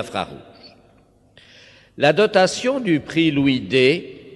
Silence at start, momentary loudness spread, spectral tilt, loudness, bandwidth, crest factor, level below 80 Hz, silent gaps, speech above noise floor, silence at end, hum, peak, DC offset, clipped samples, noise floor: 0 s; 10 LU; -5 dB/octave; -18 LUFS; 12 kHz; 18 dB; -56 dBFS; none; 36 dB; 0 s; none; -2 dBFS; under 0.1%; under 0.1%; -55 dBFS